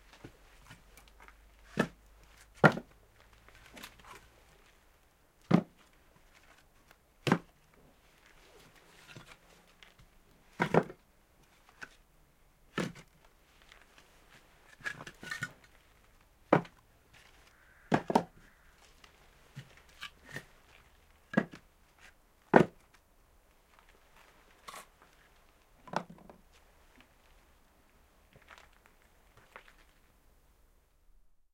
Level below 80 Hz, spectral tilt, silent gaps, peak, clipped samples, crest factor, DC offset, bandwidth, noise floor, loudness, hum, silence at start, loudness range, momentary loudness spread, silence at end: -66 dBFS; -6.5 dB/octave; none; -4 dBFS; under 0.1%; 34 dB; under 0.1%; 16.5 kHz; -66 dBFS; -33 LUFS; none; 0.25 s; 14 LU; 30 LU; 5.5 s